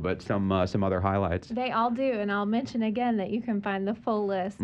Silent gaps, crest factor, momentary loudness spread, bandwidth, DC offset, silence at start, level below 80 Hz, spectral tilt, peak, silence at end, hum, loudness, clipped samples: none; 16 dB; 4 LU; 8.4 kHz; under 0.1%; 0 s; -54 dBFS; -7.5 dB/octave; -10 dBFS; 0 s; none; -28 LUFS; under 0.1%